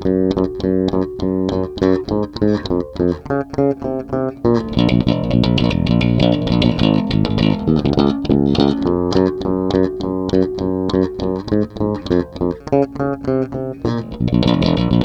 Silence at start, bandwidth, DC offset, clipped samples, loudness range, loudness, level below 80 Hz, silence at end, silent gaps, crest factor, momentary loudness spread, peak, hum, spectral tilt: 0 s; 8 kHz; under 0.1%; under 0.1%; 4 LU; -17 LUFS; -34 dBFS; 0 s; none; 16 dB; 7 LU; 0 dBFS; none; -8 dB/octave